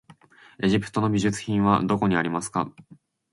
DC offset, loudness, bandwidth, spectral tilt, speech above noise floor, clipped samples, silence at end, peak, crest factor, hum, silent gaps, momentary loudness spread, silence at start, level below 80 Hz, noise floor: under 0.1%; -24 LUFS; 11.5 kHz; -6 dB/octave; 29 dB; under 0.1%; 0.4 s; -6 dBFS; 20 dB; none; none; 7 LU; 0.6 s; -52 dBFS; -52 dBFS